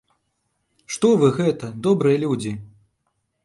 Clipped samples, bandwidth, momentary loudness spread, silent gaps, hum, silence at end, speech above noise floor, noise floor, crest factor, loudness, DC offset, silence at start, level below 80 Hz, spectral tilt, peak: under 0.1%; 11.5 kHz; 14 LU; none; none; 0.8 s; 54 dB; -73 dBFS; 18 dB; -20 LUFS; under 0.1%; 0.9 s; -60 dBFS; -6.5 dB/octave; -4 dBFS